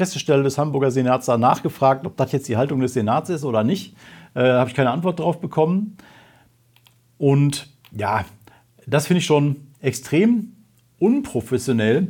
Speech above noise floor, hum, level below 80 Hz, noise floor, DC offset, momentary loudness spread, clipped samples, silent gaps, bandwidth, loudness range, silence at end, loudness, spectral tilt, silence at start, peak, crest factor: 37 dB; none; -60 dBFS; -56 dBFS; under 0.1%; 8 LU; under 0.1%; none; 18.5 kHz; 3 LU; 0 s; -20 LUFS; -6.5 dB/octave; 0 s; -2 dBFS; 18 dB